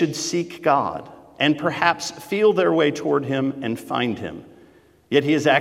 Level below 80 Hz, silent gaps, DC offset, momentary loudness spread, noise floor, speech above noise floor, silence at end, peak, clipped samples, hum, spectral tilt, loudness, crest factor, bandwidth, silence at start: -64 dBFS; none; under 0.1%; 11 LU; -52 dBFS; 32 dB; 0 s; -2 dBFS; under 0.1%; none; -4.5 dB/octave; -21 LUFS; 20 dB; 15.5 kHz; 0 s